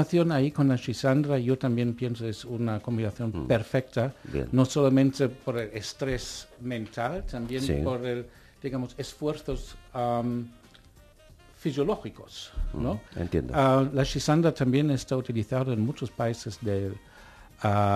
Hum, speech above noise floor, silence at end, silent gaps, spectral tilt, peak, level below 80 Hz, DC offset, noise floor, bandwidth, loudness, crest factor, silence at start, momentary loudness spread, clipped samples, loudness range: none; 27 dB; 0 s; none; -6.5 dB/octave; -8 dBFS; -44 dBFS; under 0.1%; -55 dBFS; 14 kHz; -28 LUFS; 20 dB; 0 s; 12 LU; under 0.1%; 7 LU